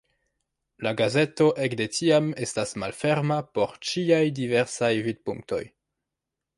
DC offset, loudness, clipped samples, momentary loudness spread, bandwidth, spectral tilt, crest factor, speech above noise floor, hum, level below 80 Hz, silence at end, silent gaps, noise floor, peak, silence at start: under 0.1%; -25 LUFS; under 0.1%; 10 LU; 11.5 kHz; -5 dB/octave; 18 dB; 61 dB; none; -64 dBFS; 0.9 s; none; -86 dBFS; -8 dBFS; 0.8 s